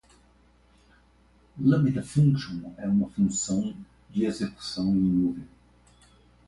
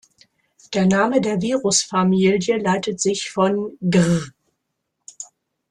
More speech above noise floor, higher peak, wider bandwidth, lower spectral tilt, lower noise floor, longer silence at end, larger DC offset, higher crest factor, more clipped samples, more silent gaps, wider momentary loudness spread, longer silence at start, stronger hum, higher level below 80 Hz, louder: second, 35 dB vs 58 dB; second, -10 dBFS vs -4 dBFS; about the same, 11.5 kHz vs 11 kHz; first, -6.5 dB/octave vs -5 dB/octave; second, -60 dBFS vs -76 dBFS; first, 1 s vs 0.45 s; neither; about the same, 18 dB vs 16 dB; neither; neither; second, 11 LU vs 18 LU; first, 1.55 s vs 0.7 s; first, 60 Hz at -50 dBFS vs none; about the same, -54 dBFS vs -58 dBFS; second, -26 LUFS vs -19 LUFS